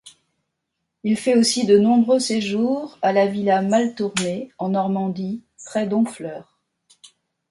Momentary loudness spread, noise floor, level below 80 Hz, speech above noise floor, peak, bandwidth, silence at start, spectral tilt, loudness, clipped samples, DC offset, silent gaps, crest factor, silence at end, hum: 13 LU; -78 dBFS; -64 dBFS; 59 dB; -4 dBFS; 11.5 kHz; 0.05 s; -5 dB/octave; -20 LUFS; under 0.1%; under 0.1%; none; 16 dB; 1.1 s; none